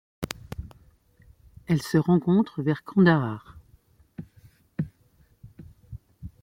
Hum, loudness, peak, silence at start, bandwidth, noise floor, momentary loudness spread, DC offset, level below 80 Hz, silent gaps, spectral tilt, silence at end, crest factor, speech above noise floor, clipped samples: none; -25 LUFS; -6 dBFS; 0.2 s; 16 kHz; -61 dBFS; 26 LU; under 0.1%; -52 dBFS; none; -7.5 dB/octave; 0.15 s; 22 dB; 39 dB; under 0.1%